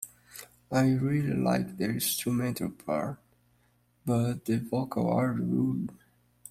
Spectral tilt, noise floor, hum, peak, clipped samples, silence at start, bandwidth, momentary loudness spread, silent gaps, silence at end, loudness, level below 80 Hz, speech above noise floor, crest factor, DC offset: -6 dB/octave; -68 dBFS; 60 Hz at -50 dBFS; -14 dBFS; under 0.1%; 0 s; 16 kHz; 13 LU; none; 0 s; -30 LUFS; -62 dBFS; 39 dB; 16 dB; under 0.1%